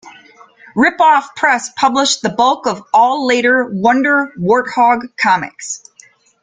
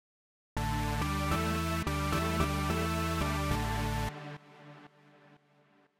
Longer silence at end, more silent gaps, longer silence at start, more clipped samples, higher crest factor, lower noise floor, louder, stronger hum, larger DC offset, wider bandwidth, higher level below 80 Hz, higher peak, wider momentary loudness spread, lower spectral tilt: about the same, 0.65 s vs 0.65 s; neither; second, 0.05 s vs 0.55 s; neither; about the same, 14 dB vs 18 dB; second, -47 dBFS vs -66 dBFS; first, -13 LUFS vs -32 LUFS; neither; neither; second, 9.6 kHz vs 17 kHz; second, -56 dBFS vs -42 dBFS; first, 0 dBFS vs -14 dBFS; second, 7 LU vs 15 LU; second, -3.5 dB/octave vs -5 dB/octave